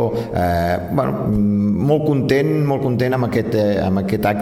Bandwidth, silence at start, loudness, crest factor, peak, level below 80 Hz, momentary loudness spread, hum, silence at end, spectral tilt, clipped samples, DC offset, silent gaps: 16.5 kHz; 0 s; -18 LUFS; 14 dB; -2 dBFS; -40 dBFS; 3 LU; none; 0 s; -8 dB/octave; under 0.1%; under 0.1%; none